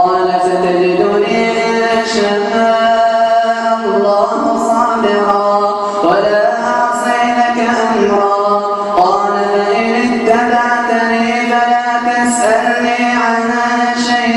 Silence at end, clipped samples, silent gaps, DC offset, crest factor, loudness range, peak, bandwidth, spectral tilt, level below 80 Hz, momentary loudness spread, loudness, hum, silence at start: 0 s; under 0.1%; none; under 0.1%; 12 dB; 0 LU; 0 dBFS; 12 kHz; -4 dB/octave; -52 dBFS; 2 LU; -12 LUFS; none; 0 s